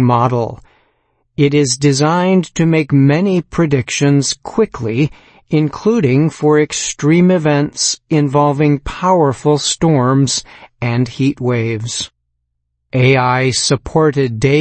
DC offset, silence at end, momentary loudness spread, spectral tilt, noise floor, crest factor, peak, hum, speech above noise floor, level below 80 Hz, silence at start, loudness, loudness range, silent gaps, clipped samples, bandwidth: under 0.1%; 0 s; 7 LU; -5.5 dB/octave; -70 dBFS; 14 dB; 0 dBFS; none; 56 dB; -42 dBFS; 0 s; -14 LUFS; 3 LU; none; under 0.1%; 8.8 kHz